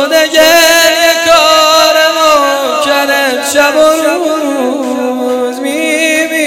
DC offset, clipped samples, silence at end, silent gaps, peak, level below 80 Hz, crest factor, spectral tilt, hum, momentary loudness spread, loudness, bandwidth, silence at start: under 0.1%; 0.9%; 0 s; none; 0 dBFS; -48 dBFS; 8 dB; -0.5 dB/octave; none; 9 LU; -8 LUFS; 19 kHz; 0 s